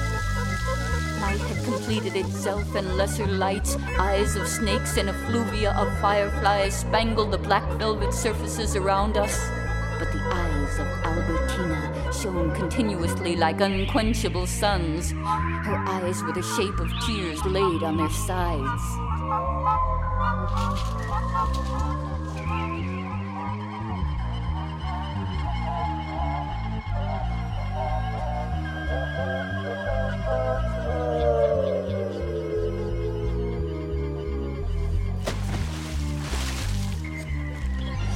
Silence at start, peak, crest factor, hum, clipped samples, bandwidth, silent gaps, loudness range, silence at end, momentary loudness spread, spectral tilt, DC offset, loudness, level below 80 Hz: 0 s; -6 dBFS; 18 dB; none; under 0.1%; 16 kHz; none; 5 LU; 0 s; 7 LU; -5.5 dB/octave; under 0.1%; -26 LUFS; -32 dBFS